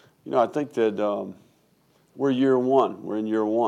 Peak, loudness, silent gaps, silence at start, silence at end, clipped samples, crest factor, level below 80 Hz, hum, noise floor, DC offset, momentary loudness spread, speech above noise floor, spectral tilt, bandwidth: -8 dBFS; -24 LUFS; none; 0.25 s; 0 s; under 0.1%; 16 dB; -78 dBFS; none; -63 dBFS; under 0.1%; 8 LU; 40 dB; -7.5 dB/octave; 9.6 kHz